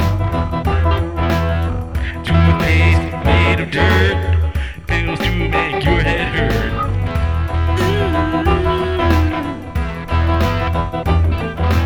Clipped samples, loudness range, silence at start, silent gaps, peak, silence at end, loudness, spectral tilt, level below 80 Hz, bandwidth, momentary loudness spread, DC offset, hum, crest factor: under 0.1%; 2 LU; 0 s; none; -2 dBFS; 0 s; -17 LUFS; -7 dB/octave; -22 dBFS; 15.5 kHz; 7 LU; 0.7%; none; 14 dB